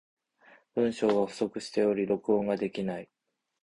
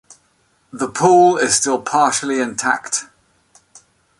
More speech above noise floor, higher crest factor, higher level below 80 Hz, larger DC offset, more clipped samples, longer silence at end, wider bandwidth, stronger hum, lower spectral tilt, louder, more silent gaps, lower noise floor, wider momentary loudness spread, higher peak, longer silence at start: second, 32 dB vs 45 dB; about the same, 16 dB vs 16 dB; second, -68 dBFS vs -60 dBFS; neither; neither; second, 0.6 s vs 1.15 s; about the same, 11 kHz vs 11.5 kHz; neither; first, -6 dB/octave vs -3 dB/octave; second, -29 LUFS vs -16 LUFS; neither; about the same, -61 dBFS vs -60 dBFS; second, 8 LU vs 12 LU; second, -14 dBFS vs -2 dBFS; about the same, 0.75 s vs 0.75 s